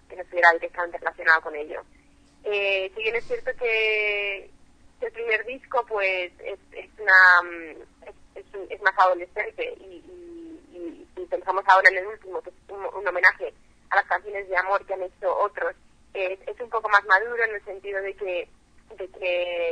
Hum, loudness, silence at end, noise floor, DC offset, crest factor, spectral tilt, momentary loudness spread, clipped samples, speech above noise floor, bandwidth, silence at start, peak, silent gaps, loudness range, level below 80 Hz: none; -23 LUFS; 0 s; -54 dBFS; under 0.1%; 24 dB; -2.5 dB/octave; 21 LU; under 0.1%; 30 dB; 10 kHz; 0.1 s; 0 dBFS; none; 6 LU; -58 dBFS